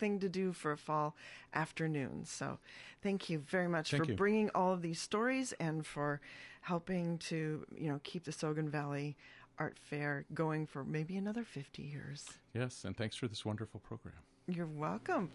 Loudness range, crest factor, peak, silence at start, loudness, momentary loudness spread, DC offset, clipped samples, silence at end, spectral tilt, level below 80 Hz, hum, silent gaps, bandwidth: 6 LU; 18 dB; -20 dBFS; 0 s; -39 LUFS; 12 LU; under 0.1%; under 0.1%; 0 s; -5.5 dB/octave; -70 dBFS; none; none; 11.5 kHz